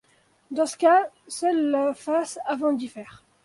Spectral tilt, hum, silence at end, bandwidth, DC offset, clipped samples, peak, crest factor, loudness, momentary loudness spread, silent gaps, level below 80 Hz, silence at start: -3.5 dB/octave; none; 0.35 s; 11.5 kHz; under 0.1%; under 0.1%; -8 dBFS; 16 dB; -24 LUFS; 14 LU; none; -72 dBFS; 0.5 s